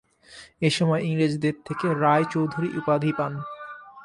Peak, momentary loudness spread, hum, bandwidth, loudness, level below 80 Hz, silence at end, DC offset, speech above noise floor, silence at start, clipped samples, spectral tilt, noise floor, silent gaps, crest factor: -8 dBFS; 13 LU; none; 11.5 kHz; -24 LUFS; -64 dBFS; 0 s; under 0.1%; 25 dB; 0.3 s; under 0.1%; -6.5 dB/octave; -49 dBFS; none; 18 dB